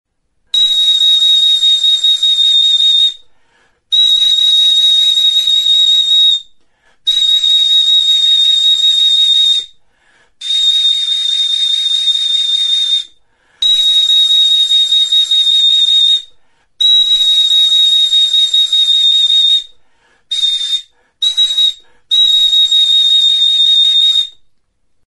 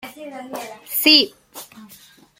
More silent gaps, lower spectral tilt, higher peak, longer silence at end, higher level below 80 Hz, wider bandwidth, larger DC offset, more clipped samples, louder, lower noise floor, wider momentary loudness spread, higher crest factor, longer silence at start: neither; second, 4.5 dB/octave vs -0.5 dB/octave; about the same, -2 dBFS vs 0 dBFS; first, 0.8 s vs 0.55 s; first, -54 dBFS vs -68 dBFS; second, 12 kHz vs 17 kHz; neither; neither; first, -7 LUFS vs -14 LUFS; first, -56 dBFS vs -48 dBFS; second, 7 LU vs 26 LU; second, 10 dB vs 22 dB; first, 0.55 s vs 0.05 s